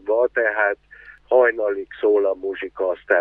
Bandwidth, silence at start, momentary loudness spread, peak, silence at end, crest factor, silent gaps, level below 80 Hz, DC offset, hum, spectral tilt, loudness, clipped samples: 3.9 kHz; 0.05 s; 9 LU; -4 dBFS; 0 s; 18 dB; none; -60 dBFS; under 0.1%; none; -6.5 dB/octave; -20 LUFS; under 0.1%